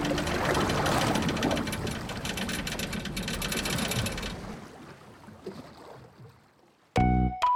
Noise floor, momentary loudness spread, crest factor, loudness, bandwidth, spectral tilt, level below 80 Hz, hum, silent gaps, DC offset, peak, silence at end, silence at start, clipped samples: -62 dBFS; 21 LU; 16 dB; -29 LUFS; 19.5 kHz; -4.5 dB/octave; -42 dBFS; none; none; under 0.1%; -14 dBFS; 0 s; 0 s; under 0.1%